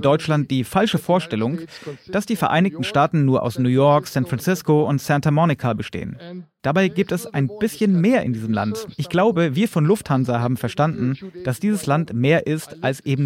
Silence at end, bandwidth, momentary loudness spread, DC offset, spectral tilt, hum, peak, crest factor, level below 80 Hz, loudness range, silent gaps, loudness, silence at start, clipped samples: 0 s; 16.5 kHz; 9 LU; under 0.1%; -6.5 dB/octave; none; -4 dBFS; 16 dB; -54 dBFS; 3 LU; none; -20 LUFS; 0 s; under 0.1%